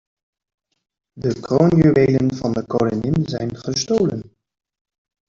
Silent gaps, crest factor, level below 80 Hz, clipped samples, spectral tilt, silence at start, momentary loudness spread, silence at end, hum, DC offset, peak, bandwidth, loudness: none; 16 dB; -48 dBFS; under 0.1%; -6.5 dB/octave; 1.15 s; 11 LU; 1.05 s; none; under 0.1%; -2 dBFS; 7.6 kHz; -18 LUFS